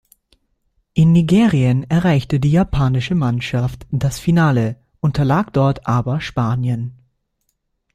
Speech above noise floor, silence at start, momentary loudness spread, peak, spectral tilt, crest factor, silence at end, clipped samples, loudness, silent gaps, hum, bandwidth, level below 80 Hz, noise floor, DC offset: 54 dB; 0.95 s; 9 LU; -4 dBFS; -7.5 dB/octave; 14 dB; 1 s; under 0.1%; -17 LUFS; none; none; 13 kHz; -38 dBFS; -70 dBFS; under 0.1%